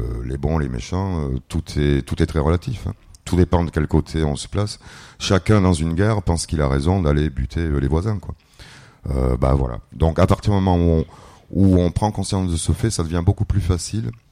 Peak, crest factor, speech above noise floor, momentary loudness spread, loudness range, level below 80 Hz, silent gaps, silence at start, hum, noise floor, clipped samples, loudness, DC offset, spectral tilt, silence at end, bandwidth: -4 dBFS; 16 dB; 25 dB; 10 LU; 3 LU; -28 dBFS; none; 0 s; none; -44 dBFS; under 0.1%; -20 LUFS; under 0.1%; -6.5 dB/octave; 0.15 s; 12.5 kHz